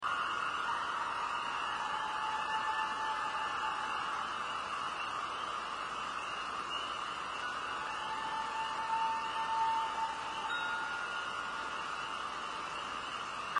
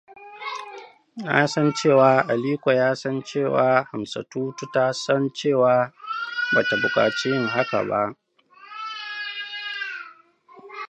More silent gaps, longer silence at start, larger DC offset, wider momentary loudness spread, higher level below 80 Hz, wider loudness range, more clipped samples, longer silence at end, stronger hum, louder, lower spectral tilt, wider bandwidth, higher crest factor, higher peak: neither; about the same, 0 s vs 0.1 s; neither; second, 5 LU vs 16 LU; about the same, -68 dBFS vs -70 dBFS; second, 3 LU vs 6 LU; neither; about the same, 0 s vs 0.05 s; neither; second, -36 LUFS vs -22 LUFS; second, -1.5 dB/octave vs -5 dB/octave; first, 10.5 kHz vs 9 kHz; second, 16 dB vs 22 dB; second, -20 dBFS vs -2 dBFS